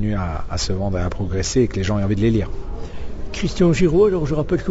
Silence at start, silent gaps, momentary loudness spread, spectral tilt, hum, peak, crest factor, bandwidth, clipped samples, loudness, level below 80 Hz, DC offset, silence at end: 0 s; none; 17 LU; -6 dB/octave; none; -4 dBFS; 16 dB; 8 kHz; under 0.1%; -20 LUFS; -30 dBFS; under 0.1%; 0 s